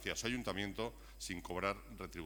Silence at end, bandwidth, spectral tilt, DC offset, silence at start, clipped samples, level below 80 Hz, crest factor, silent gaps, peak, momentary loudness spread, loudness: 0 s; over 20 kHz; -3.5 dB/octave; under 0.1%; 0 s; under 0.1%; -56 dBFS; 22 dB; none; -22 dBFS; 8 LU; -42 LUFS